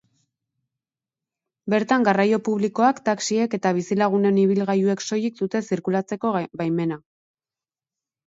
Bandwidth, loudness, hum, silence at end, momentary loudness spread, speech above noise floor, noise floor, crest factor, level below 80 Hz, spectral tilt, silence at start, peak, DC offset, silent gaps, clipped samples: 7.8 kHz; -22 LUFS; none; 1.3 s; 7 LU; over 69 dB; under -90 dBFS; 18 dB; -70 dBFS; -6 dB/octave; 1.65 s; -4 dBFS; under 0.1%; none; under 0.1%